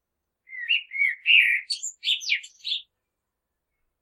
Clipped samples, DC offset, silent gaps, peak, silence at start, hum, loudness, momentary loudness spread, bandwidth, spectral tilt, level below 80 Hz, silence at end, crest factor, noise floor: under 0.1%; under 0.1%; none; -4 dBFS; 0.5 s; none; -22 LUFS; 14 LU; 15 kHz; 8 dB/octave; -86 dBFS; 1.2 s; 22 dB; -82 dBFS